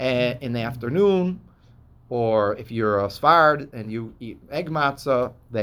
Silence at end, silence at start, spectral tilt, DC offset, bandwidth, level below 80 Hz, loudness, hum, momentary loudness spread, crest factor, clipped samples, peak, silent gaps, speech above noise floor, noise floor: 0 s; 0 s; -7 dB/octave; under 0.1%; over 20 kHz; -52 dBFS; -22 LUFS; none; 15 LU; 20 dB; under 0.1%; -2 dBFS; none; 30 dB; -52 dBFS